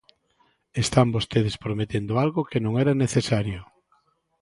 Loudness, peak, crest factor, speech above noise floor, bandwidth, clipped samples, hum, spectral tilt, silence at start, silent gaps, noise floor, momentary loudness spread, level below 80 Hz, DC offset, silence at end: -24 LUFS; -2 dBFS; 24 dB; 43 dB; 11.5 kHz; under 0.1%; none; -6 dB/octave; 0.75 s; none; -66 dBFS; 8 LU; -50 dBFS; under 0.1%; 0.75 s